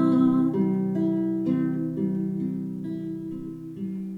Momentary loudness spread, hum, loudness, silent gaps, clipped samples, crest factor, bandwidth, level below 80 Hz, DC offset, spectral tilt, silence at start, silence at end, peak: 13 LU; none; -26 LUFS; none; under 0.1%; 14 dB; 4.5 kHz; -62 dBFS; under 0.1%; -10.5 dB/octave; 0 s; 0 s; -12 dBFS